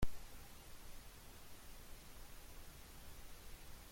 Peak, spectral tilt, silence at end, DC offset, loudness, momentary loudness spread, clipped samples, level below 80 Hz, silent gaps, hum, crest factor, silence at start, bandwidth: -24 dBFS; -4 dB/octave; 0 s; under 0.1%; -57 LUFS; 1 LU; under 0.1%; -54 dBFS; none; none; 22 dB; 0 s; 16.5 kHz